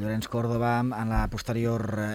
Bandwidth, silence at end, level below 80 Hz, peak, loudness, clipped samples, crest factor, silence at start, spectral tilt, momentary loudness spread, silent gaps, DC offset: over 20 kHz; 0 s; -38 dBFS; -14 dBFS; -28 LUFS; under 0.1%; 14 dB; 0 s; -7 dB/octave; 4 LU; none; under 0.1%